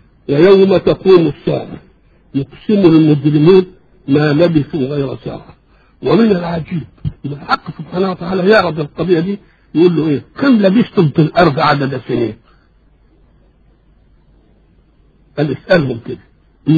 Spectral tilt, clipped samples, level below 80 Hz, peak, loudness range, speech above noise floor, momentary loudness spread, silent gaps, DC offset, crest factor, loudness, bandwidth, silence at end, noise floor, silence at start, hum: -9 dB/octave; under 0.1%; -44 dBFS; 0 dBFS; 9 LU; 38 dB; 16 LU; none; under 0.1%; 14 dB; -13 LUFS; 6.8 kHz; 0 s; -50 dBFS; 0.3 s; none